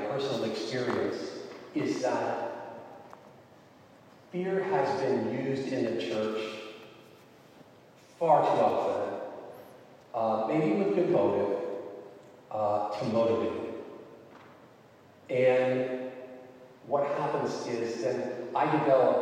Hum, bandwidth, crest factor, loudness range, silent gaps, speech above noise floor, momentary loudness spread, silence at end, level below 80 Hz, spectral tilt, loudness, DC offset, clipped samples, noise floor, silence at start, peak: none; 10 kHz; 20 dB; 5 LU; none; 28 dB; 20 LU; 0 s; -80 dBFS; -6.5 dB/octave; -30 LUFS; under 0.1%; under 0.1%; -56 dBFS; 0 s; -10 dBFS